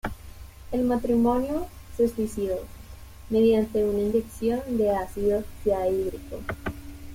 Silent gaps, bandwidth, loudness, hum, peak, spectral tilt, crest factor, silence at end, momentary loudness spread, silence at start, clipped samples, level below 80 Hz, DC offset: none; 16.5 kHz; -26 LUFS; none; -10 dBFS; -7 dB/octave; 14 dB; 0 s; 17 LU; 0.05 s; under 0.1%; -44 dBFS; under 0.1%